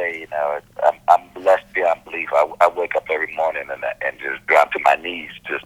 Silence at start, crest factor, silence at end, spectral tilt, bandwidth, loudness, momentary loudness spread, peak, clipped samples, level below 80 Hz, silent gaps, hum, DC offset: 0 s; 20 dB; 0.05 s; -3.5 dB/octave; 16 kHz; -19 LUFS; 10 LU; 0 dBFS; under 0.1%; -58 dBFS; none; none; under 0.1%